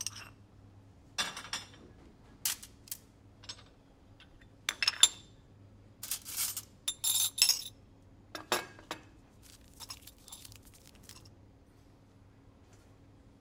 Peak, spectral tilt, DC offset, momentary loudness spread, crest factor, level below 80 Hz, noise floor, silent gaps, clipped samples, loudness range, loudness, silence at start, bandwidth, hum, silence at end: -2 dBFS; 0.5 dB/octave; under 0.1%; 27 LU; 36 dB; -64 dBFS; -60 dBFS; none; under 0.1%; 22 LU; -32 LUFS; 0 s; 18 kHz; none; 2.1 s